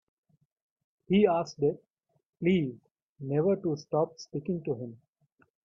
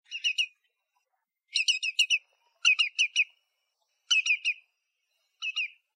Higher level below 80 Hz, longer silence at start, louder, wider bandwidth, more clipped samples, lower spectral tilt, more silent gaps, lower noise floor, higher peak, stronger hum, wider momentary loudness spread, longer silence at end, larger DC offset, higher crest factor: first, -68 dBFS vs under -90 dBFS; first, 1.1 s vs 0.1 s; second, -30 LUFS vs -26 LUFS; second, 7.2 kHz vs 15.5 kHz; neither; first, -7.5 dB/octave vs 12 dB/octave; first, 2.29-2.33 s, 3.02-3.15 s vs none; second, -70 dBFS vs -81 dBFS; about the same, -12 dBFS vs -12 dBFS; neither; about the same, 12 LU vs 10 LU; first, 0.7 s vs 0.3 s; neither; about the same, 20 dB vs 20 dB